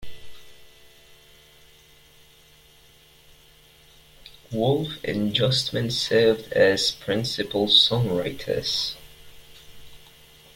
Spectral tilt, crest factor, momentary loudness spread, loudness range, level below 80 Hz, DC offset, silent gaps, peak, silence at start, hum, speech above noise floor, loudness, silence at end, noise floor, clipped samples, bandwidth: -4.5 dB/octave; 24 dB; 11 LU; 11 LU; -54 dBFS; under 0.1%; none; -2 dBFS; 0 s; none; 31 dB; -22 LUFS; 0.6 s; -54 dBFS; under 0.1%; 16.5 kHz